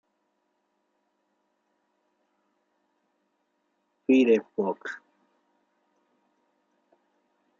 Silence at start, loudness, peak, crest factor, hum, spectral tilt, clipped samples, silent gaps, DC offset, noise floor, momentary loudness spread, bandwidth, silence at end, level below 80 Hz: 4.1 s; -25 LUFS; -10 dBFS; 22 dB; none; -4.5 dB/octave; under 0.1%; none; under 0.1%; -76 dBFS; 18 LU; 7.2 kHz; 2.65 s; -84 dBFS